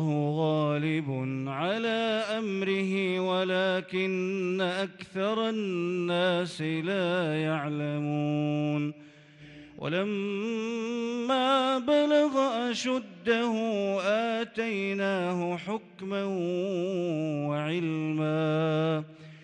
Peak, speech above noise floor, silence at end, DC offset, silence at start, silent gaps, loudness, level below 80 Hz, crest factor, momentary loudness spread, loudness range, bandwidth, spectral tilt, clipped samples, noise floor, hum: -14 dBFS; 23 dB; 0 s; under 0.1%; 0 s; none; -29 LUFS; -74 dBFS; 16 dB; 6 LU; 4 LU; 10.5 kHz; -6 dB/octave; under 0.1%; -51 dBFS; none